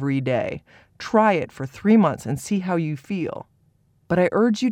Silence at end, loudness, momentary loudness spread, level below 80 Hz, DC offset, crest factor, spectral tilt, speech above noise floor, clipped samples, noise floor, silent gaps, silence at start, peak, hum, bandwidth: 0 s; -22 LUFS; 13 LU; -58 dBFS; under 0.1%; 16 dB; -7 dB/octave; 40 dB; under 0.1%; -62 dBFS; none; 0 s; -6 dBFS; none; 13.5 kHz